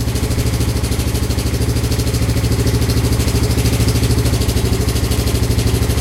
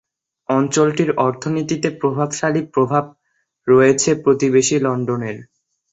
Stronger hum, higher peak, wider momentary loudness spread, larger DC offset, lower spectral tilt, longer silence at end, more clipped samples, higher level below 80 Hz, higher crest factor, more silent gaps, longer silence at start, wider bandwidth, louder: neither; about the same, -2 dBFS vs -2 dBFS; second, 3 LU vs 11 LU; neither; about the same, -5 dB/octave vs -5 dB/octave; second, 0 s vs 0.5 s; neither; first, -20 dBFS vs -58 dBFS; about the same, 12 dB vs 16 dB; neither; second, 0 s vs 0.5 s; first, 16.5 kHz vs 8.2 kHz; about the same, -16 LUFS vs -17 LUFS